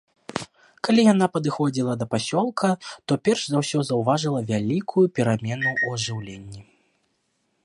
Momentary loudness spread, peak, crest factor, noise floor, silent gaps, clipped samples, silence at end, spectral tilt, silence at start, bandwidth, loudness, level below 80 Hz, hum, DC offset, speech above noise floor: 15 LU; -4 dBFS; 18 dB; -71 dBFS; none; under 0.1%; 1.05 s; -5.5 dB/octave; 0.3 s; 11 kHz; -23 LUFS; -60 dBFS; none; under 0.1%; 49 dB